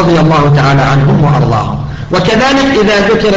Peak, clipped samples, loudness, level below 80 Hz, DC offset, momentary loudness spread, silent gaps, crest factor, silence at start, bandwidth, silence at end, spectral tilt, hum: 0 dBFS; under 0.1%; -8 LUFS; -28 dBFS; under 0.1%; 6 LU; none; 8 dB; 0 s; 7.8 kHz; 0 s; -6.5 dB/octave; none